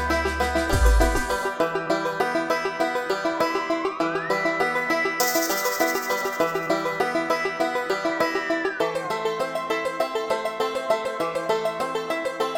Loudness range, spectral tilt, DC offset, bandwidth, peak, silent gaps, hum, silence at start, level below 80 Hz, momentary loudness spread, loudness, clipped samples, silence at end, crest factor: 3 LU; -4 dB/octave; under 0.1%; 17.5 kHz; -6 dBFS; none; none; 0 s; -34 dBFS; 5 LU; -24 LUFS; under 0.1%; 0 s; 18 dB